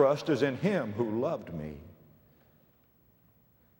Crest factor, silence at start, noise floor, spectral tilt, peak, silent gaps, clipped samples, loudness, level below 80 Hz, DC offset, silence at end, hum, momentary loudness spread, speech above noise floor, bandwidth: 22 dB; 0 s; -65 dBFS; -7 dB/octave; -10 dBFS; none; under 0.1%; -31 LUFS; -62 dBFS; under 0.1%; 1.85 s; none; 14 LU; 36 dB; 16.5 kHz